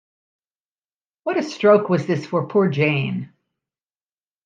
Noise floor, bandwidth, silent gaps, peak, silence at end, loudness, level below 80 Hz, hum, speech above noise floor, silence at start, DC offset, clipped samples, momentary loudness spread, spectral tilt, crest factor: under -90 dBFS; 7.6 kHz; none; -2 dBFS; 1.2 s; -19 LUFS; -70 dBFS; none; over 71 dB; 1.25 s; under 0.1%; under 0.1%; 14 LU; -7 dB/octave; 20 dB